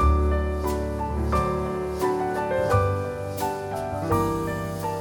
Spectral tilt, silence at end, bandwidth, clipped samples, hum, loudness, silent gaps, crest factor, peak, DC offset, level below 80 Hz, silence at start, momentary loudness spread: -7 dB/octave; 0 s; 17.5 kHz; under 0.1%; none; -26 LUFS; none; 18 dB; -8 dBFS; under 0.1%; -30 dBFS; 0 s; 7 LU